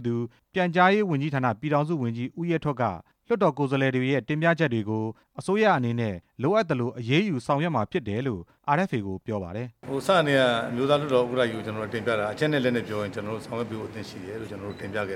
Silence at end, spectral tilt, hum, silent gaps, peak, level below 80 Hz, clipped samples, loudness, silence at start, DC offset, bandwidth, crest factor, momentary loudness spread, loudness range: 0 s; -6.5 dB/octave; none; none; -8 dBFS; -62 dBFS; under 0.1%; -26 LUFS; 0 s; under 0.1%; 14 kHz; 18 dB; 12 LU; 3 LU